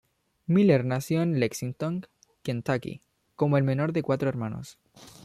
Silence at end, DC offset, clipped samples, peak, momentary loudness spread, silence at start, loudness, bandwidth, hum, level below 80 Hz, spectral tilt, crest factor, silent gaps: 0.2 s; under 0.1%; under 0.1%; -10 dBFS; 17 LU; 0.5 s; -27 LUFS; 14.5 kHz; none; -64 dBFS; -7 dB/octave; 18 dB; none